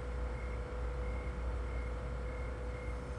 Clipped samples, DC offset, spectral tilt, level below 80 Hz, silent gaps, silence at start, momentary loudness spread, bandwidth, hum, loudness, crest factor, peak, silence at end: under 0.1%; under 0.1%; -7 dB/octave; -40 dBFS; none; 0 s; 2 LU; 10.5 kHz; none; -41 LUFS; 10 dB; -28 dBFS; 0 s